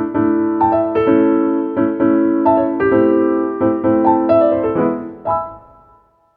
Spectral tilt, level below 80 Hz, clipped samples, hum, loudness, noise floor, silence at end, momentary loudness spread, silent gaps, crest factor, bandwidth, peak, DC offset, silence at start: -11 dB/octave; -48 dBFS; under 0.1%; none; -15 LUFS; -52 dBFS; 0.75 s; 7 LU; none; 14 dB; 3.9 kHz; 0 dBFS; under 0.1%; 0 s